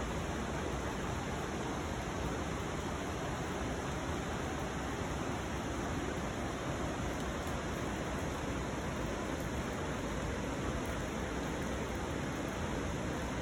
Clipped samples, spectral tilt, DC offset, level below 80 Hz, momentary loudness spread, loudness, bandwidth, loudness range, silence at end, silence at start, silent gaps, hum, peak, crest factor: under 0.1%; -5 dB/octave; under 0.1%; -46 dBFS; 1 LU; -38 LUFS; 19 kHz; 0 LU; 0 s; 0 s; none; none; -24 dBFS; 14 dB